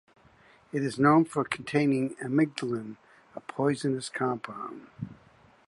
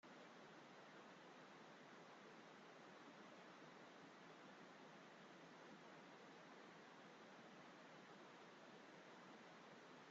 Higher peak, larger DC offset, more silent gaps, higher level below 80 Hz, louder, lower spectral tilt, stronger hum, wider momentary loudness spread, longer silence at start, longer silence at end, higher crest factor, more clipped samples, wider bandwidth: first, -10 dBFS vs -48 dBFS; neither; neither; first, -68 dBFS vs under -90 dBFS; first, -28 LUFS vs -63 LUFS; first, -6.5 dB/octave vs -2.5 dB/octave; neither; first, 20 LU vs 1 LU; first, 0.75 s vs 0.05 s; first, 0.55 s vs 0 s; first, 20 dB vs 14 dB; neither; first, 11.5 kHz vs 7.6 kHz